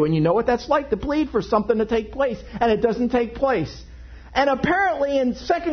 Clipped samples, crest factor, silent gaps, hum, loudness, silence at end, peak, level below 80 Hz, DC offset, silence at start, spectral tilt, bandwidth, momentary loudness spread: under 0.1%; 16 dB; none; none; -21 LUFS; 0 s; -4 dBFS; -42 dBFS; under 0.1%; 0 s; -7 dB/octave; 6.6 kHz; 5 LU